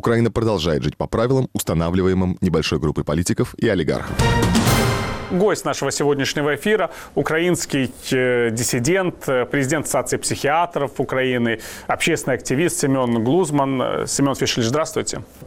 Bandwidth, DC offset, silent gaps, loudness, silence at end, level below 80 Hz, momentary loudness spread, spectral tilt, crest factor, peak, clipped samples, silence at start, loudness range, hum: 16.5 kHz; under 0.1%; none; -20 LUFS; 0 s; -38 dBFS; 4 LU; -5 dB/octave; 12 dB; -8 dBFS; under 0.1%; 0.05 s; 1 LU; none